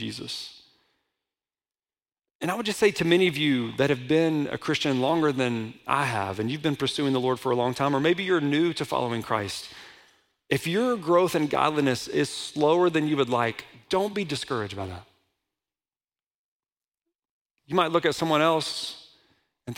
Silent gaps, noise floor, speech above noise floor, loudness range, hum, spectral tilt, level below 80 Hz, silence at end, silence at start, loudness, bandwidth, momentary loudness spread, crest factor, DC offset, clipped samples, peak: 2.35-2.39 s, 16.30-16.63 s, 16.88-16.92 s, 17.15-17.23 s, 17.31-17.45 s; under -90 dBFS; over 65 dB; 7 LU; none; -5 dB/octave; -64 dBFS; 0 s; 0 s; -25 LUFS; 16.5 kHz; 12 LU; 20 dB; under 0.1%; under 0.1%; -6 dBFS